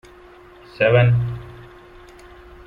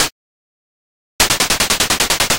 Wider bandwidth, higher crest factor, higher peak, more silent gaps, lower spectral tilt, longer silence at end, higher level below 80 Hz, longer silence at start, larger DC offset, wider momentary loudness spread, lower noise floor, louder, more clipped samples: second, 5 kHz vs 17.5 kHz; about the same, 18 dB vs 18 dB; second, -4 dBFS vs 0 dBFS; second, none vs 0.12-1.19 s; first, -8.5 dB/octave vs -0.5 dB/octave; first, 1.05 s vs 0 s; second, -44 dBFS vs -36 dBFS; first, 0.8 s vs 0 s; neither; first, 20 LU vs 3 LU; second, -45 dBFS vs under -90 dBFS; second, -18 LUFS vs -14 LUFS; neither